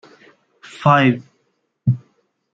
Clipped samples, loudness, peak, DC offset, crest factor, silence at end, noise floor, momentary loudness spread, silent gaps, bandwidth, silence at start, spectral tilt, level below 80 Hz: under 0.1%; -18 LUFS; -2 dBFS; under 0.1%; 18 dB; 0.55 s; -68 dBFS; 13 LU; none; 7.8 kHz; 0.8 s; -7.5 dB/octave; -62 dBFS